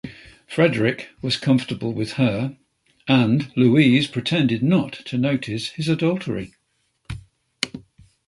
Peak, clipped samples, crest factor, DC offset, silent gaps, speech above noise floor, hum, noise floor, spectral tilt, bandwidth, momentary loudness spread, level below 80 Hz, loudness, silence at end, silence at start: 0 dBFS; under 0.1%; 20 dB; under 0.1%; none; 49 dB; none; -69 dBFS; -6.5 dB/octave; 11.5 kHz; 18 LU; -52 dBFS; -21 LUFS; 0.5 s; 0.05 s